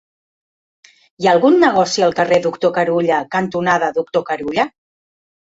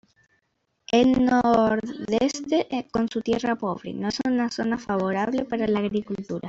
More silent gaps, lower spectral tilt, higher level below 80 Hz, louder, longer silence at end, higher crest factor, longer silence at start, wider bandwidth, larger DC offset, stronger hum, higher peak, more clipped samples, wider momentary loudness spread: neither; about the same, -5 dB/octave vs -5.5 dB/octave; about the same, -58 dBFS vs -54 dBFS; first, -16 LUFS vs -24 LUFS; first, 0.75 s vs 0 s; about the same, 16 dB vs 18 dB; first, 1.2 s vs 0.9 s; about the same, 8 kHz vs 7.8 kHz; neither; neither; first, -2 dBFS vs -6 dBFS; neither; about the same, 8 LU vs 9 LU